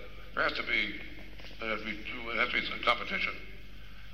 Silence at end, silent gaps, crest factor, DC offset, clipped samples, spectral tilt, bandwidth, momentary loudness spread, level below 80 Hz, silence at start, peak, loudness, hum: 0 s; none; 24 dB; 0.7%; under 0.1%; -4 dB/octave; 16 kHz; 19 LU; -52 dBFS; 0 s; -12 dBFS; -32 LUFS; none